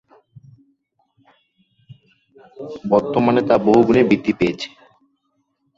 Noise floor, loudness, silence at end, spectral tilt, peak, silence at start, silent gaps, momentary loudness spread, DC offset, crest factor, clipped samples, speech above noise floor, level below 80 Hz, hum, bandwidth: -69 dBFS; -16 LUFS; 1.1 s; -7.5 dB/octave; 0 dBFS; 1.9 s; none; 18 LU; under 0.1%; 20 dB; under 0.1%; 53 dB; -52 dBFS; none; 7.6 kHz